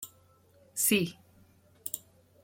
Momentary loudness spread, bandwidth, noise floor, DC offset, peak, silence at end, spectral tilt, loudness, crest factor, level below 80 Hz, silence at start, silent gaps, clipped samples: 16 LU; 16.5 kHz; -63 dBFS; under 0.1%; -14 dBFS; 0.45 s; -3 dB/octave; -31 LUFS; 22 dB; -74 dBFS; 0 s; none; under 0.1%